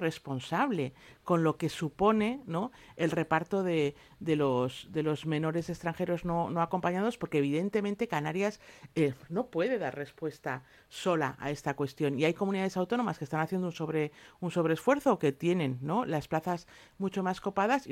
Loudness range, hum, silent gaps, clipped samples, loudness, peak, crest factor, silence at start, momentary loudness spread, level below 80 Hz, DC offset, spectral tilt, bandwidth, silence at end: 3 LU; none; none; under 0.1%; -32 LUFS; -12 dBFS; 18 dB; 0 s; 9 LU; -64 dBFS; under 0.1%; -6.5 dB/octave; 16 kHz; 0 s